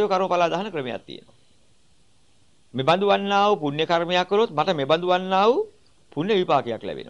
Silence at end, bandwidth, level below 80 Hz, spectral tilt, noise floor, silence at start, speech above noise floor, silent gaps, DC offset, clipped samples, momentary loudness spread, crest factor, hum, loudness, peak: 0 s; 10.5 kHz; -66 dBFS; -5.5 dB/octave; -62 dBFS; 0 s; 41 dB; none; 0.2%; under 0.1%; 15 LU; 18 dB; none; -22 LUFS; -6 dBFS